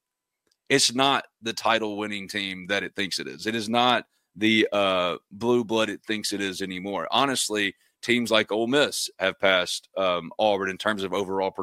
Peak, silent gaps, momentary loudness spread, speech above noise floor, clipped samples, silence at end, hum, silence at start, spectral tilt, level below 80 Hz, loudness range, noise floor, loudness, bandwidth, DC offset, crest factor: -4 dBFS; none; 8 LU; 54 dB; under 0.1%; 0 s; none; 0.7 s; -3 dB/octave; -68 dBFS; 2 LU; -79 dBFS; -24 LUFS; 16 kHz; under 0.1%; 22 dB